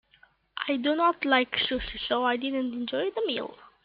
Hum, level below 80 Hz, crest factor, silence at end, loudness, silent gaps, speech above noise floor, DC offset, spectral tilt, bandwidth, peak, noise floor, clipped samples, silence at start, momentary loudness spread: none; -54 dBFS; 20 dB; 0.15 s; -27 LUFS; none; 35 dB; under 0.1%; -7 dB/octave; 5.2 kHz; -10 dBFS; -62 dBFS; under 0.1%; 0.55 s; 10 LU